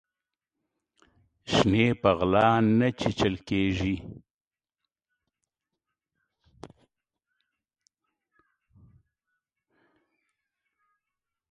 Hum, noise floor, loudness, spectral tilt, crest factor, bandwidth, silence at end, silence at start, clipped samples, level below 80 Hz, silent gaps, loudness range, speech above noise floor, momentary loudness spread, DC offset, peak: none; -89 dBFS; -25 LUFS; -6.5 dB/octave; 26 dB; 9.2 kHz; 7.3 s; 1.45 s; under 0.1%; -52 dBFS; none; 10 LU; 65 dB; 10 LU; under 0.1%; -6 dBFS